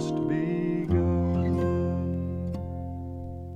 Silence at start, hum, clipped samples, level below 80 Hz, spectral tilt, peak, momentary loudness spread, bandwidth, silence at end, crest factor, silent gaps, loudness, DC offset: 0 s; none; under 0.1%; -42 dBFS; -9 dB/octave; -14 dBFS; 11 LU; 8.2 kHz; 0 s; 14 dB; none; -28 LUFS; under 0.1%